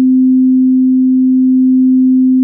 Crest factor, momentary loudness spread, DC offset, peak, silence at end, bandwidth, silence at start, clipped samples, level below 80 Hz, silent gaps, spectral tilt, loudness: 4 dB; 1 LU; under 0.1%; -4 dBFS; 0 s; 0.4 kHz; 0 s; under 0.1%; -72 dBFS; none; -17.5 dB/octave; -9 LUFS